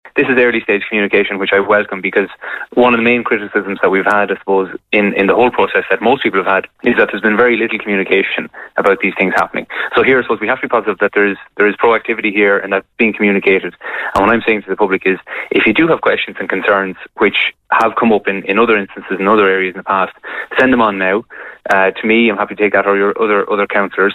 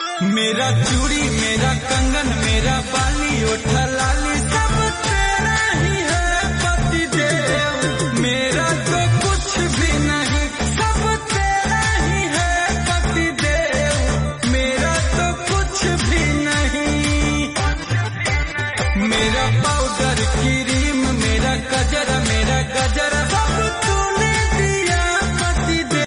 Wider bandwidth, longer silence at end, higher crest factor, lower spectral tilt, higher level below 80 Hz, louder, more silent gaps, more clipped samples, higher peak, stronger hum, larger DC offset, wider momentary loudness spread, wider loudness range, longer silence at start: second, 9.6 kHz vs 11 kHz; about the same, 0 s vs 0 s; about the same, 14 dB vs 12 dB; first, -6.5 dB/octave vs -4 dB/octave; second, -50 dBFS vs -24 dBFS; first, -13 LUFS vs -18 LUFS; neither; neither; first, 0 dBFS vs -6 dBFS; neither; neither; first, 6 LU vs 2 LU; about the same, 1 LU vs 1 LU; about the same, 0.05 s vs 0 s